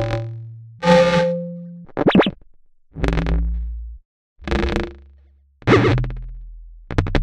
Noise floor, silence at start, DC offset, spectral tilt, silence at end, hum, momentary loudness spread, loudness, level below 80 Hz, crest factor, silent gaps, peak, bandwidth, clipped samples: -52 dBFS; 0 s; under 0.1%; -7 dB/octave; 0 s; none; 21 LU; -19 LUFS; -28 dBFS; 20 dB; 4.05-4.36 s; 0 dBFS; 10 kHz; under 0.1%